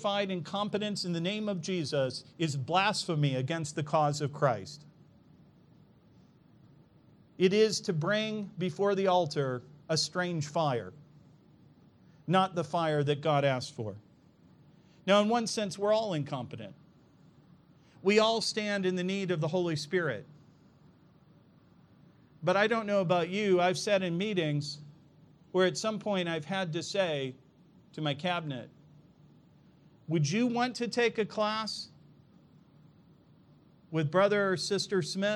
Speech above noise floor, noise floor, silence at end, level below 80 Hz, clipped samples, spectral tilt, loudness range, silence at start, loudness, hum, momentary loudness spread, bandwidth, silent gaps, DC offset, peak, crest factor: 31 dB; -61 dBFS; 0 s; -76 dBFS; under 0.1%; -5 dB/octave; 5 LU; 0 s; -30 LUFS; none; 11 LU; 12.5 kHz; none; under 0.1%; -12 dBFS; 20 dB